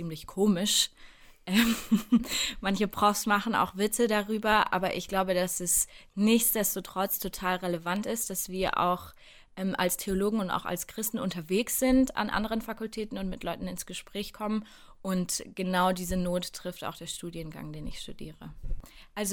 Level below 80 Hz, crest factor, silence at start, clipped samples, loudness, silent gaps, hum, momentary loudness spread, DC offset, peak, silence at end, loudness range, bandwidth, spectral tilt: -48 dBFS; 20 dB; 0 s; under 0.1%; -29 LUFS; none; none; 15 LU; under 0.1%; -10 dBFS; 0 s; 6 LU; 19 kHz; -3.5 dB/octave